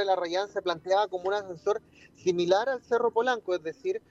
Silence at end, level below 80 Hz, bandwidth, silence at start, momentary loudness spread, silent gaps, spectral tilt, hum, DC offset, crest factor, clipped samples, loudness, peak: 0.15 s; -70 dBFS; 7.8 kHz; 0 s; 7 LU; none; -4.5 dB/octave; none; under 0.1%; 18 dB; under 0.1%; -29 LUFS; -10 dBFS